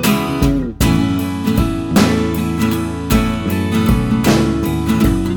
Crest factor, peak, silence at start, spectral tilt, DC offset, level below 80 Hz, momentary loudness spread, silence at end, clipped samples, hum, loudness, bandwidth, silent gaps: 14 dB; 0 dBFS; 0 s; -6 dB/octave; under 0.1%; -26 dBFS; 4 LU; 0 s; under 0.1%; none; -16 LUFS; 19.5 kHz; none